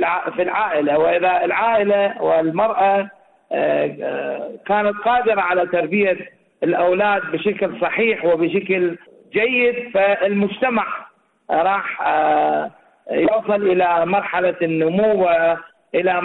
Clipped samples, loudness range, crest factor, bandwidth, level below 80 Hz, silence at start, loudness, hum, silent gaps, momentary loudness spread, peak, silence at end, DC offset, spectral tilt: under 0.1%; 2 LU; 10 dB; 4.1 kHz; -58 dBFS; 0 s; -18 LUFS; none; none; 8 LU; -8 dBFS; 0 s; under 0.1%; -9.5 dB/octave